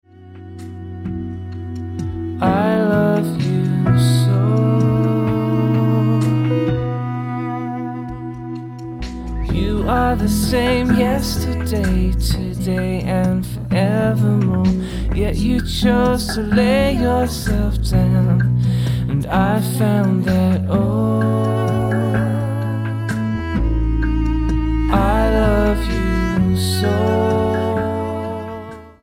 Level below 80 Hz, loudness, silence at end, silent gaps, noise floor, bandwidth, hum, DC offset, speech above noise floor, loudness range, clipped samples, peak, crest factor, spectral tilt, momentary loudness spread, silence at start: -26 dBFS; -18 LUFS; 0.1 s; none; -37 dBFS; 16.5 kHz; none; under 0.1%; 21 dB; 4 LU; under 0.1%; -2 dBFS; 16 dB; -7 dB/octave; 12 LU; 0.2 s